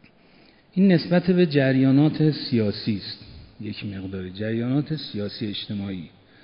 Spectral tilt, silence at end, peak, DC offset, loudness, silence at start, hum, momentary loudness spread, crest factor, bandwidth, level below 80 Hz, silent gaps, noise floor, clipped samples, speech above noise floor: -12 dB/octave; 0.35 s; -6 dBFS; under 0.1%; -23 LUFS; 0.75 s; none; 15 LU; 18 dB; 5.4 kHz; -58 dBFS; none; -54 dBFS; under 0.1%; 32 dB